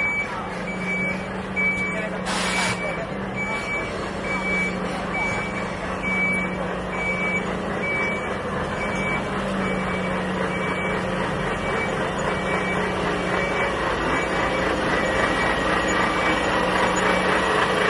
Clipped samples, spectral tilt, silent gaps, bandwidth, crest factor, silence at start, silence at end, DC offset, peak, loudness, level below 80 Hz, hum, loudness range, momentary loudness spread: under 0.1%; -4.5 dB/octave; none; 11.5 kHz; 16 dB; 0 s; 0 s; under 0.1%; -8 dBFS; -23 LUFS; -42 dBFS; none; 4 LU; 6 LU